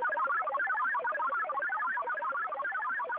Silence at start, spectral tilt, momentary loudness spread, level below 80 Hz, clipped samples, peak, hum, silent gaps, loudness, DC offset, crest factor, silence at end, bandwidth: 0 s; 1 dB/octave; 4 LU; -84 dBFS; under 0.1%; -24 dBFS; none; none; -32 LUFS; under 0.1%; 8 dB; 0 s; 4.6 kHz